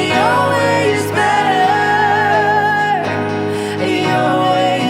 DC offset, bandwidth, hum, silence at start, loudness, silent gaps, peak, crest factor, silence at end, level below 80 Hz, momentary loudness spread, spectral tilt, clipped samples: under 0.1%; 16 kHz; none; 0 s; -14 LUFS; none; -2 dBFS; 12 dB; 0 s; -54 dBFS; 6 LU; -5 dB/octave; under 0.1%